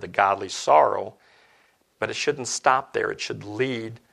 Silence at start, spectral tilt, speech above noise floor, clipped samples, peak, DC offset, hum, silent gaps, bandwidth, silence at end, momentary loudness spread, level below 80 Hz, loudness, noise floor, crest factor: 0 s; -3 dB/octave; 38 dB; under 0.1%; -2 dBFS; under 0.1%; none; none; 12.5 kHz; 0.15 s; 13 LU; -68 dBFS; -24 LUFS; -62 dBFS; 22 dB